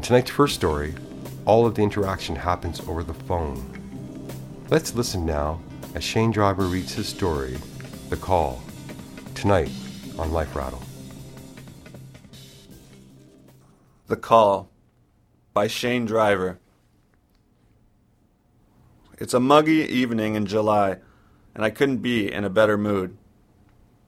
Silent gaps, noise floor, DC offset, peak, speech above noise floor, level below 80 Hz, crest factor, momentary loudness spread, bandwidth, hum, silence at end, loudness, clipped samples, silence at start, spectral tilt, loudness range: none; -61 dBFS; under 0.1%; -2 dBFS; 39 dB; -42 dBFS; 24 dB; 20 LU; 16.5 kHz; none; 0.9 s; -23 LUFS; under 0.1%; 0 s; -5.5 dB/octave; 8 LU